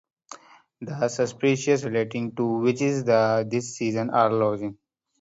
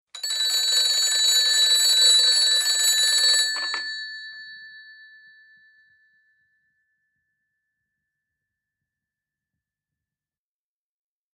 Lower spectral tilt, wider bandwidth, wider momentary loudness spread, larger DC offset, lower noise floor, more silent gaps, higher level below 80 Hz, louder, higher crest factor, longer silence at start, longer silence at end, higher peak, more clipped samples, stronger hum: first, -6 dB/octave vs 5.5 dB/octave; second, 8 kHz vs 15 kHz; second, 14 LU vs 18 LU; neither; second, -47 dBFS vs under -90 dBFS; neither; first, -68 dBFS vs -82 dBFS; second, -24 LUFS vs -17 LUFS; about the same, 20 dB vs 18 dB; first, 0.3 s vs 0.15 s; second, 0.5 s vs 6.55 s; about the same, -6 dBFS vs -6 dBFS; neither; neither